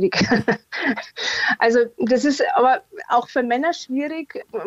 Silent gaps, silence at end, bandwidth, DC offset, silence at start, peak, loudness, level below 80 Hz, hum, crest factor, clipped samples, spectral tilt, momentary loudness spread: none; 0 s; 8.2 kHz; under 0.1%; 0 s; -4 dBFS; -20 LUFS; -60 dBFS; none; 16 dB; under 0.1%; -4.5 dB/octave; 8 LU